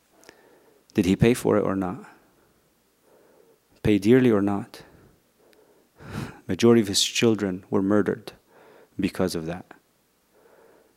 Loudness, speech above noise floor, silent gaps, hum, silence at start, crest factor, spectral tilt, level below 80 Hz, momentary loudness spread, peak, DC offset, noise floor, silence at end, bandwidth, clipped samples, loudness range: -23 LUFS; 44 dB; none; none; 0.95 s; 20 dB; -5 dB/octave; -54 dBFS; 18 LU; -4 dBFS; under 0.1%; -66 dBFS; 1.35 s; 16 kHz; under 0.1%; 3 LU